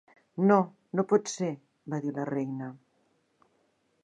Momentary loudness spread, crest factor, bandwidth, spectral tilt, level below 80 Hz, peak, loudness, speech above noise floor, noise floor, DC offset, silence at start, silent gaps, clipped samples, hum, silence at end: 17 LU; 22 dB; 10.5 kHz; -6.5 dB/octave; -82 dBFS; -8 dBFS; -29 LUFS; 43 dB; -72 dBFS; under 0.1%; 0.35 s; none; under 0.1%; none; 1.25 s